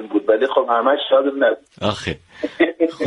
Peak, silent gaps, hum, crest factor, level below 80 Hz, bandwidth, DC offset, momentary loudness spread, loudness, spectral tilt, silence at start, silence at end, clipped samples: -2 dBFS; none; none; 16 dB; -52 dBFS; 10.5 kHz; under 0.1%; 11 LU; -18 LUFS; -5.5 dB/octave; 0 s; 0 s; under 0.1%